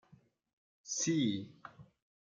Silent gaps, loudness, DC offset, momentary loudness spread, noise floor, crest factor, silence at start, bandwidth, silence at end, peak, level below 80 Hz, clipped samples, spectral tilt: none; -35 LUFS; under 0.1%; 23 LU; -67 dBFS; 18 dB; 0.85 s; 10 kHz; 0.4 s; -22 dBFS; -80 dBFS; under 0.1%; -4 dB/octave